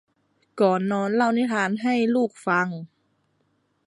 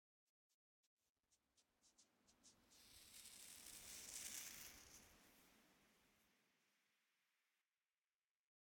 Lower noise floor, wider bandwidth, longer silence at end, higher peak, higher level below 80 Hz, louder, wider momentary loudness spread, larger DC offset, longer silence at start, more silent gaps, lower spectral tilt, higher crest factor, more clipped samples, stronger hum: second, -69 dBFS vs under -90 dBFS; second, 11.5 kHz vs 19 kHz; second, 1 s vs 1.9 s; first, -6 dBFS vs -34 dBFS; first, -74 dBFS vs -86 dBFS; first, -23 LUFS vs -56 LUFS; second, 3 LU vs 15 LU; neither; second, 0.55 s vs 1.3 s; neither; first, -6.5 dB/octave vs 0 dB/octave; second, 18 dB vs 32 dB; neither; first, 50 Hz at -70 dBFS vs none